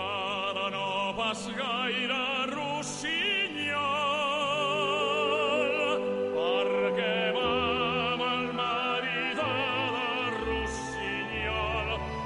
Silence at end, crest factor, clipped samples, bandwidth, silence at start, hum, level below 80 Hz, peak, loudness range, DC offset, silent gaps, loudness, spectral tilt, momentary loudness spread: 0 s; 14 dB; under 0.1%; 11.5 kHz; 0 s; none; -50 dBFS; -16 dBFS; 2 LU; under 0.1%; none; -29 LUFS; -3.5 dB/octave; 4 LU